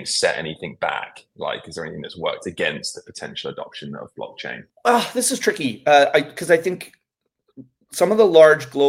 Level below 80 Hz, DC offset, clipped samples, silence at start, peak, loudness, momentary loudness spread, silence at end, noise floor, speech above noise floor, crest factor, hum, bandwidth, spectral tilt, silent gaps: -64 dBFS; under 0.1%; under 0.1%; 0 s; 0 dBFS; -19 LUFS; 19 LU; 0 s; -77 dBFS; 58 dB; 20 dB; none; 16.5 kHz; -3 dB/octave; none